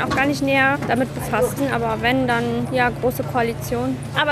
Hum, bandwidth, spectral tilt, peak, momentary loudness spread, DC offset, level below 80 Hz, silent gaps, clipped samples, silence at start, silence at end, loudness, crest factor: none; 14.5 kHz; -5.5 dB/octave; -4 dBFS; 6 LU; under 0.1%; -42 dBFS; none; under 0.1%; 0 s; 0 s; -20 LUFS; 16 dB